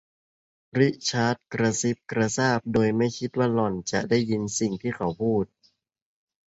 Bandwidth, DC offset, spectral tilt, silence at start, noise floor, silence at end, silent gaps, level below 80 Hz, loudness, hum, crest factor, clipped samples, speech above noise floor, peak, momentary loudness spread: 8 kHz; under 0.1%; -5 dB/octave; 0.75 s; -67 dBFS; 1 s; none; -58 dBFS; -25 LUFS; none; 18 dB; under 0.1%; 42 dB; -6 dBFS; 5 LU